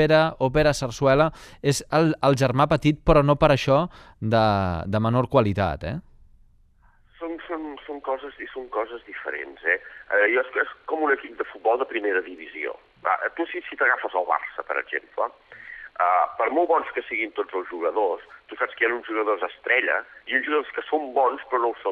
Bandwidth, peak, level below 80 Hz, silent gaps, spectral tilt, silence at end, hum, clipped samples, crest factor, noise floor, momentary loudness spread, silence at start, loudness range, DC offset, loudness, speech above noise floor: 13.5 kHz; -2 dBFS; -44 dBFS; none; -6 dB/octave; 0 s; none; under 0.1%; 22 dB; -57 dBFS; 13 LU; 0 s; 8 LU; under 0.1%; -24 LUFS; 34 dB